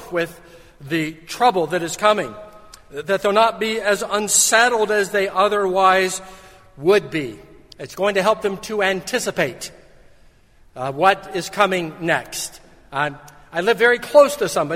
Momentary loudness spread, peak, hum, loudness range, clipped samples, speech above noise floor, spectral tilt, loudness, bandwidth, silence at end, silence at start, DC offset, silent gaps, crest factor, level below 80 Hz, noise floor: 15 LU; 0 dBFS; none; 6 LU; under 0.1%; 31 dB; -2.5 dB/octave; -19 LUFS; 16.5 kHz; 0 s; 0 s; under 0.1%; none; 20 dB; -54 dBFS; -50 dBFS